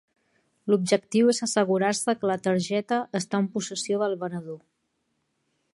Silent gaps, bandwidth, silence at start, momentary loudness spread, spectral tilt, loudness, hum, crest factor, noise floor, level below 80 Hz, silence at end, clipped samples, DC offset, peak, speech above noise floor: none; 11.5 kHz; 0.65 s; 11 LU; -4.5 dB/octave; -25 LUFS; none; 18 dB; -75 dBFS; -74 dBFS; 1.15 s; under 0.1%; under 0.1%; -8 dBFS; 50 dB